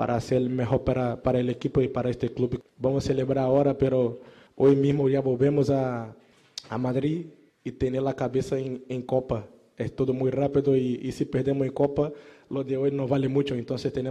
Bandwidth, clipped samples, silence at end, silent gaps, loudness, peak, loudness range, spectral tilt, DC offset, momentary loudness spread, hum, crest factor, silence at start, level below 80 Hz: 10 kHz; under 0.1%; 0 s; none; -26 LUFS; -10 dBFS; 5 LU; -8 dB/octave; under 0.1%; 11 LU; none; 16 dB; 0 s; -52 dBFS